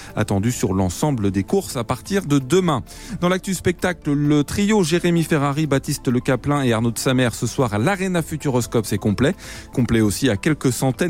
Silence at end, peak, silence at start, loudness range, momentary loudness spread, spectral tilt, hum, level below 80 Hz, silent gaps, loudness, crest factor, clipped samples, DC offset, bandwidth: 0 s; -6 dBFS; 0 s; 2 LU; 5 LU; -5.5 dB/octave; none; -42 dBFS; none; -20 LUFS; 14 dB; under 0.1%; 0.3%; 16.5 kHz